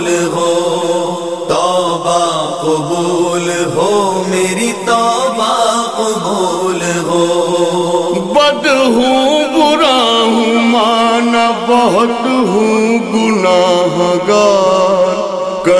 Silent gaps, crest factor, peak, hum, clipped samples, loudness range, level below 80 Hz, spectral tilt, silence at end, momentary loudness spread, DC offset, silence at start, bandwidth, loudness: none; 12 dB; 0 dBFS; none; under 0.1%; 3 LU; -50 dBFS; -4 dB/octave; 0 s; 5 LU; 0.5%; 0 s; 11 kHz; -12 LUFS